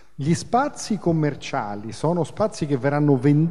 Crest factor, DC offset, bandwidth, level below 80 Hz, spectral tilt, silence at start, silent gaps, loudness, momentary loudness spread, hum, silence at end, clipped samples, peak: 16 dB; 0.9%; 11.5 kHz; -56 dBFS; -7 dB/octave; 0.2 s; none; -23 LUFS; 9 LU; none; 0 s; under 0.1%; -6 dBFS